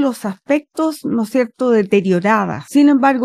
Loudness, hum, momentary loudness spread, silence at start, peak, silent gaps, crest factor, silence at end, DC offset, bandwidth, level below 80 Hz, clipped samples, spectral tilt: -16 LUFS; none; 8 LU; 0 s; -2 dBFS; none; 14 dB; 0 s; under 0.1%; 14.5 kHz; -62 dBFS; under 0.1%; -6.5 dB/octave